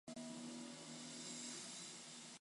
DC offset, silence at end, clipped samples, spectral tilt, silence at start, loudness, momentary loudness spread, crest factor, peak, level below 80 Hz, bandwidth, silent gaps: under 0.1%; 0 s; under 0.1%; -2 dB/octave; 0.05 s; -51 LUFS; 4 LU; 14 dB; -38 dBFS; under -90 dBFS; 11.5 kHz; none